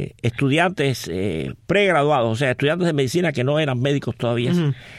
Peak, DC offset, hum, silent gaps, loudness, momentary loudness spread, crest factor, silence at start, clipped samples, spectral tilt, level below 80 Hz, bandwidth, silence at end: -4 dBFS; under 0.1%; none; none; -20 LUFS; 7 LU; 16 dB; 0 s; under 0.1%; -6 dB/octave; -50 dBFS; 14.5 kHz; 0 s